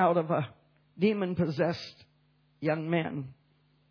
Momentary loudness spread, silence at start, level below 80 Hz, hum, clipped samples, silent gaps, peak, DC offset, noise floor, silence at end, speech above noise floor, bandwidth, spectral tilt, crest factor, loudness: 13 LU; 0 s; -70 dBFS; none; under 0.1%; none; -12 dBFS; under 0.1%; -67 dBFS; 0.6 s; 39 dB; 5.4 kHz; -8 dB/octave; 20 dB; -31 LUFS